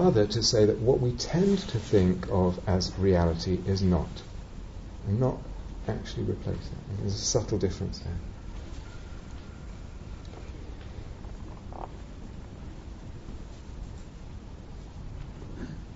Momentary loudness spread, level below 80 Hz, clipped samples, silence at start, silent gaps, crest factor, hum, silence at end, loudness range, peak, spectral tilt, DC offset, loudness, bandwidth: 19 LU; -42 dBFS; under 0.1%; 0 s; none; 20 dB; none; 0 s; 17 LU; -10 dBFS; -6.5 dB/octave; under 0.1%; -28 LUFS; 7.6 kHz